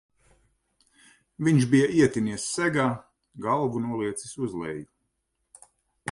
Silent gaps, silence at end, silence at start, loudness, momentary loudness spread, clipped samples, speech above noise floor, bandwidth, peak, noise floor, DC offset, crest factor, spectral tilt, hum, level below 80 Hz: none; 0 s; 1.4 s; -25 LUFS; 15 LU; under 0.1%; 53 dB; 11.5 kHz; -8 dBFS; -77 dBFS; under 0.1%; 20 dB; -6 dB/octave; none; -62 dBFS